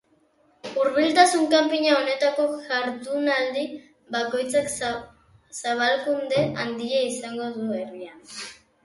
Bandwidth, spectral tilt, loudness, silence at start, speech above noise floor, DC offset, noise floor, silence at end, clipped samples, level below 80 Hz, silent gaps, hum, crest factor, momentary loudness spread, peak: 11.5 kHz; -3.5 dB/octave; -23 LUFS; 0.65 s; 39 dB; under 0.1%; -63 dBFS; 0.3 s; under 0.1%; -64 dBFS; none; none; 22 dB; 17 LU; -2 dBFS